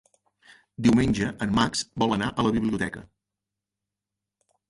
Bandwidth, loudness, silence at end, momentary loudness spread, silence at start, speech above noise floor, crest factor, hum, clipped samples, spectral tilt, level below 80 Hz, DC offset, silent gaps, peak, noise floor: 11.5 kHz; -25 LUFS; 1.65 s; 8 LU; 0.8 s; 63 dB; 18 dB; none; under 0.1%; -5 dB/octave; -48 dBFS; under 0.1%; none; -8 dBFS; -87 dBFS